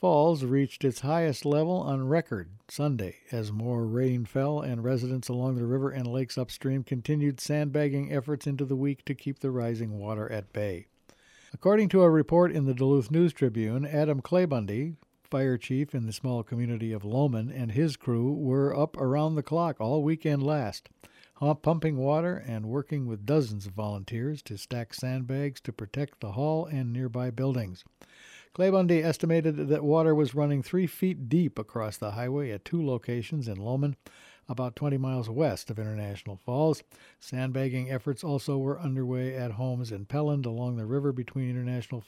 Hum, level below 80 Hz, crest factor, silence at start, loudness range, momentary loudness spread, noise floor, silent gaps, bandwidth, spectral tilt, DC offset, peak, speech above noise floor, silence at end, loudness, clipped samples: none; -64 dBFS; 18 dB; 0 s; 6 LU; 10 LU; -60 dBFS; none; 14.5 kHz; -7.5 dB/octave; under 0.1%; -10 dBFS; 32 dB; 0.05 s; -29 LUFS; under 0.1%